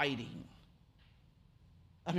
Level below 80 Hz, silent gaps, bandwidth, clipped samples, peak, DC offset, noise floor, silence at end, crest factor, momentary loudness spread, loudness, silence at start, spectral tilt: -68 dBFS; none; 13 kHz; under 0.1%; -18 dBFS; under 0.1%; -65 dBFS; 0 s; 26 dB; 24 LU; -42 LUFS; 0 s; -5.5 dB/octave